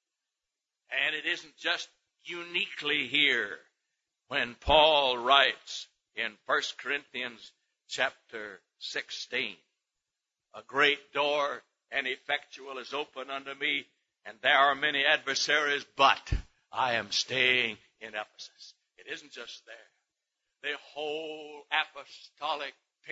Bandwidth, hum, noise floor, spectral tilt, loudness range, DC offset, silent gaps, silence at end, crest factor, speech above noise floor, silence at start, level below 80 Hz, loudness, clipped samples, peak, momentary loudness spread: 8 kHz; none; -88 dBFS; -2 dB/octave; 10 LU; under 0.1%; none; 0 s; 24 dB; 58 dB; 0.9 s; -52 dBFS; -29 LUFS; under 0.1%; -6 dBFS; 19 LU